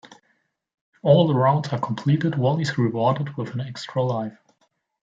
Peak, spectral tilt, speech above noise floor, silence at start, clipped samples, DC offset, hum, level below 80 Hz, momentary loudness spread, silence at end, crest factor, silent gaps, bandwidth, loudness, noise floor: -4 dBFS; -7.5 dB/octave; 48 dB; 0.05 s; under 0.1%; under 0.1%; none; -66 dBFS; 12 LU; 0.75 s; 20 dB; 0.74-0.93 s; 7.8 kHz; -22 LUFS; -69 dBFS